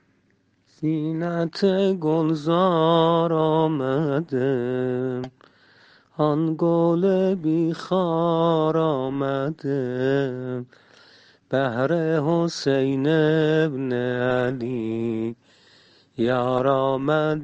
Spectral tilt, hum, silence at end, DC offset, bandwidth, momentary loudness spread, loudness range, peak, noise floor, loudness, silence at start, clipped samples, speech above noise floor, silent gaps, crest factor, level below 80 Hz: -7.5 dB/octave; none; 0 s; under 0.1%; 8.2 kHz; 7 LU; 4 LU; -6 dBFS; -64 dBFS; -22 LUFS; 0.8 s; under 0.1%; 43 dB; none; 16 dB; -62 dBFS